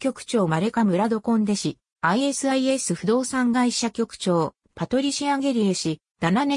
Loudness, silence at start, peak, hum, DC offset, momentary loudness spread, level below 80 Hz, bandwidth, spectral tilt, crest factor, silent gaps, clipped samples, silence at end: -23 LUFS; 0 s; -8 dBFS; none; under 0.1%; 5 LU; -60 dBFS; 11 kHz; -4.5 dB/octave; 16 dB; 1.92-1.96 s, 6.11-6.15 s; under 0.1%; 0 s